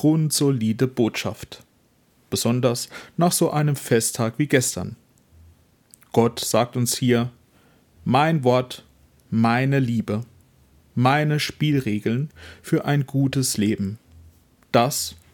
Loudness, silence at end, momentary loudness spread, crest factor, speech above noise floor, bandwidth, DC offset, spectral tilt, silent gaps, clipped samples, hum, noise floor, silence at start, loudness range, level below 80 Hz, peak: -22 LUFS; 0.2 s; 12 LU; 20 dB; 40 dB; 18 kHz; under 0.1%; -5 dB/octave; none; under 0.1%; none; -61 dBFS; 0 s; 2 LU; -60 dBFS; -2 dBFS